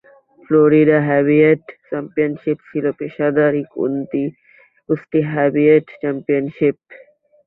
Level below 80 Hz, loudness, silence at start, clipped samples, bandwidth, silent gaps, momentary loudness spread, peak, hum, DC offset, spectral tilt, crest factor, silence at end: -60 dBFS; -17 LUFS; 0.5 s; under 0.1%; 4 kHz; none; 11 LU; -2 dBFS; none; under 0.1%; -11.5 dB/octave; 16 dB; 0.5 s